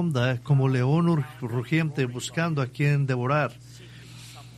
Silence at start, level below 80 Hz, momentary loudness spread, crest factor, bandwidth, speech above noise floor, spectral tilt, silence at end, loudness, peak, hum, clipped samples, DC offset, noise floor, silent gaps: 0 s; -58 dBFS; 21 LU; 16 dB; 13 kHz; 20 dB; -7 dB/octave; 0 s; -25 LUFS; -10 dBFS; none; under 0.1%; under 0.1%; -44 dBFS; none